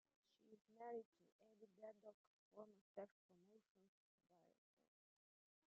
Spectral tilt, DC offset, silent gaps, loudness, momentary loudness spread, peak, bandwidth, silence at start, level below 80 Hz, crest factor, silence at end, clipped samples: -5.5 dB/octave; under 0.1%; 0.61-0.65 s, 1.05-1.12 s, 1.32-1.39 s, 2.14-2.51 s, 2.81-2.95 s, 3.11-3.29 s, 3.70-3.75 s, 3.88-4.18 s; -61 LUFS; 10 LU; -42 dBFS; 5.4 kHz; 0.4 s; under -90 dBFS; 22 dB; 1.2 s; under 0.1%